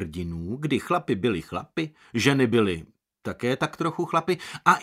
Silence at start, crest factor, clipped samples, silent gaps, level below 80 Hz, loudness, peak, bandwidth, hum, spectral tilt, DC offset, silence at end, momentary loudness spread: 0 s; 22 dB; under 0.1%; none; -54 dBFS; -26 LUFS; -4 dBFS; 15.5 kHz; none; -5.5 dB/octave; under 0.1%; 0 s; 11 LU